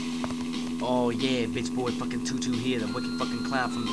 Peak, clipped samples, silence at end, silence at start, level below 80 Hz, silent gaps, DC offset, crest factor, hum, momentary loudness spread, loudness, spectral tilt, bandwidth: -14 dBFS; under 0.1%; 0 s; 0 s; -56 dBFS; none; 0.4%; 16 dB; none; 5 LU; -29 LUFS; -4.5 dB/octave; 11 kHz